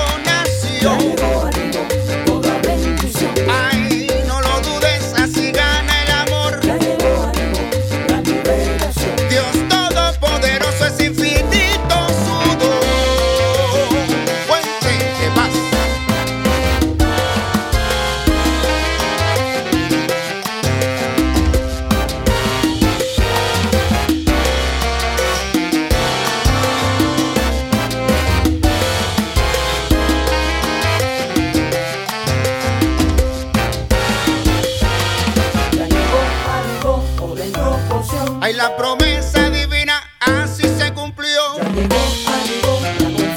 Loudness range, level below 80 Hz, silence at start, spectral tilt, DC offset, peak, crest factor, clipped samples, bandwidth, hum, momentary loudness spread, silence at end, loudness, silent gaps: 2 LU; -24 dBFS; 0 s; -4.5 dB/octave; under 0.1%; 0 dBFS; 16 dB; under 0.1%; 18 kHz; none; 4 LU; 0 s; -16 LUFS; none